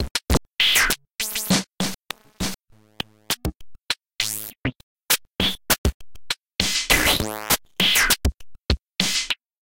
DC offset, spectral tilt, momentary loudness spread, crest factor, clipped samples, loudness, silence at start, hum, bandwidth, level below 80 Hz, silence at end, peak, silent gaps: 0.4%; -2 dB/octave; 14 LU; 22 dB; under 0.1%; -22 LUFS; 0 s; none; 17 kHz; -34 dBFS; 0.25 s; -2 dBFS; 0.11-0.15 s, 1.15-1.19 s, 4.83-4.96 s, 5.78-5.84 s, 5.94-6.00 s